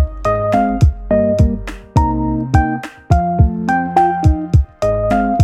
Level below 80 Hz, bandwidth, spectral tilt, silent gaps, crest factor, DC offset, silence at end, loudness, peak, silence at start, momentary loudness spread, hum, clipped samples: -20 dBFS; 9.4 kHz; -8.5 dB/octave; none; 14 dB; under 0.1%; 0 s; -15 LUFS; 0 dBFS; 0 s; 5 LU; none; under 0.1%